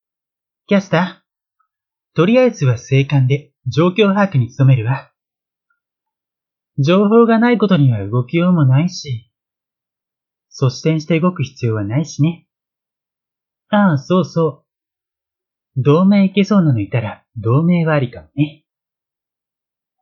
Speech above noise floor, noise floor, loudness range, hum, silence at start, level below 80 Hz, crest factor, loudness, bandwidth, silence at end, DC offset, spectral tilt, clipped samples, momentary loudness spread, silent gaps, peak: 73 dB; -87 dBFS; 5 LU; none; 0.7 s; -58 dBFS; 16 dB; -15 LUFS; 7 kHz; 1.5 s; under 0.1%; -7.5 dB/octave; under 0.1%; 10 LU; none; 0 dBFS